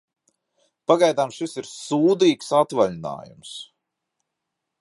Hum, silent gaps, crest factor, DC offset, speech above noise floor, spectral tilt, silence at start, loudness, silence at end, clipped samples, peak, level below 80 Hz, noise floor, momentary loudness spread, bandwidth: none; none; 20 dB; under 0.1%; 60 dB; -5 dB/octave; 0.9 s; -21 LUFS; 1.15 s; under 0.1%; -4 dBFS; -68 dBFS; -81 dBFS; 19 LU; 11.5 kHz